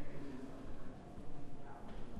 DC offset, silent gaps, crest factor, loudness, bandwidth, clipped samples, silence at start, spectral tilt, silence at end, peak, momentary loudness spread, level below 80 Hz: under 0.1%; none; 10 dB; -53 LUFS; 6.6 kHz; under 0.1%; 0 s; -7 dB/octave; 0 s; -30 dBFS; 4 LU; -52 dBFS